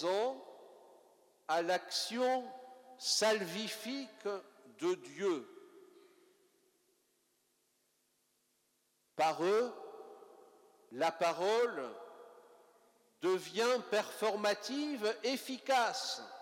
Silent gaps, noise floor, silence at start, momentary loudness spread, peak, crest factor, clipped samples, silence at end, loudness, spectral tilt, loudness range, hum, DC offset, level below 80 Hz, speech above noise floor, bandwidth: none; -78 dBFS; 0 s; 19 LU; -18 dBFS; 18 dB; under 0.1%; 0 s; -36 LUFS; -2.5 dB/octave; 7 LU; none; under 0.1%; under -90 dBFS; 43 dB; 17 kHz